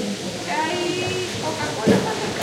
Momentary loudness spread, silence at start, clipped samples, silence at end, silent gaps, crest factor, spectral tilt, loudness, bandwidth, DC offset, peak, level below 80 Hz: 6 LU; 0 s; under 0.1%; 0 s; none; 18 dB; -4 dB/octave; -23 LUFS; 16.5 kHz; under 0.1%; -4 dBFS; -54 dBFS